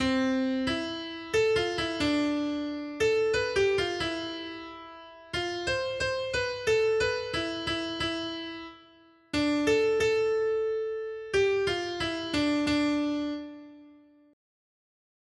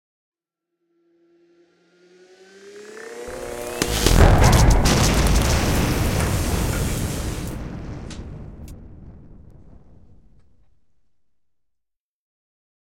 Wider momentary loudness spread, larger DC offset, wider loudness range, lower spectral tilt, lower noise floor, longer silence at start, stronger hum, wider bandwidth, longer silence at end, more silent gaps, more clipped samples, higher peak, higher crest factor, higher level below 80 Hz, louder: second, 12 LU vs 23 LU; neither; second, 3 LU vs 21 LU; about the same, -4.5 dB/octave vs -4.5 dB/octave; second, -58 dBFS vs -82 dBFS; second, 0 s vs 2.65 s; neither; second, 12.5 kHz vs 16.5 kHz; second, 1.4 s vs 3.65 s; neither; neither; second, -14 dBFS vs -2 dBFS; second, 16 dB vs 22 dB; second, -54 dBFS vs -26 dBFS; second, -28 LUFS vs -20 LUFS